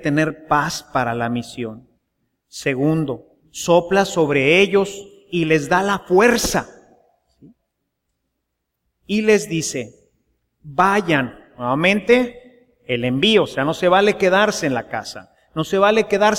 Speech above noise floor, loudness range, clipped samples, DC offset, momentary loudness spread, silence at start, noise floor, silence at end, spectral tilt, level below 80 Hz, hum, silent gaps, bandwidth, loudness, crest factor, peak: 59 dB; 7 LU; under 0.1%; under 0.1%; 15 LU; 0 s; -76 dBFS; 0 s; -4.5 dB/octave; -48 dBFS; none; none; 16.5 kHz; -18 LUFS; 18 dB; -2 dBFS